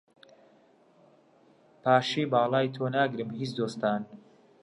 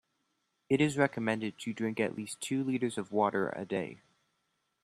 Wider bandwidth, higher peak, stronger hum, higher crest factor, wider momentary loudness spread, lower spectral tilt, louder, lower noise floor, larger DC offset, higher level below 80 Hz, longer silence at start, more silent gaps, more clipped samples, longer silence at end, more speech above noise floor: second, 11.5 kHz vs 13.5 kHz; about the same, -10 dBFS vs -12 dBFS; neither; about the same, 20 dB vs 22 dB; about the same, 10 LU vs 8 LU; about the same, -6 dB/octave vs -5.5 dB/octave; first, -28 LUFS vs -33 LUFS; second, -61 dBFS vs -80 dBFS; neither; second, -78 dBFS vs -72 dBFS; first, 1.85 s vs 0.7 s; neither; neither; second, 0.45 s vs 0.85 s; second, 34 dB vs 48 dB